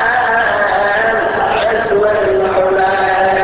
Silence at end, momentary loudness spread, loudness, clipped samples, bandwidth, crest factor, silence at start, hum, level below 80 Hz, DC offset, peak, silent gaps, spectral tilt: 0 s; 2 LU; -13 LUFS; under 0.1%; 4 kHz; 10 dB; 0 s; none; -40 dBFS; under 0.1%; -2 dBFS; none; -8 dB/octave